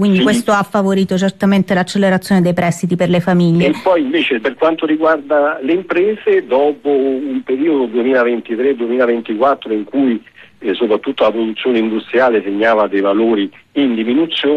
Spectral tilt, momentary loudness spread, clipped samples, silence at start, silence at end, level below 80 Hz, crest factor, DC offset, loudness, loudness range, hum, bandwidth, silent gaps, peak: -6.5 dB/octave; 4 LU; under 0.1%; 0 s; 0 s; -54 dBFS; 12 dB; under 0.1%; -14 LUFS; 2 LU; none; 13 kHz; none; -2 dBFS